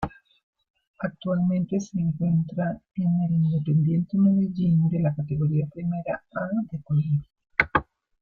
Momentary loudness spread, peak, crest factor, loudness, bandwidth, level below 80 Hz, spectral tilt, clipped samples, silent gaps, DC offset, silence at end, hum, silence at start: 8 LU; -2 dBFS; 22 dB; -25 LUFS; 7 kHz; -52 dBFS; -9 dB/octave; under 0.1%; 0.43-0.53 s, 0.70-0.74 s, 0.87-0.94 s; under 0.1%; 0.4 s; none; 0 s